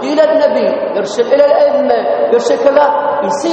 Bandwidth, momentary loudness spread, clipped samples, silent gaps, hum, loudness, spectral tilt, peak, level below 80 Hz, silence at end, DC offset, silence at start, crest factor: 8.8 kHz; 6 LU; under 0.1%; none; none; -11 LUFS; -4.5 dB/octave; 0 dBFS; -58 dBFS; 0 s; under 0.1%; 0 s; 10 dB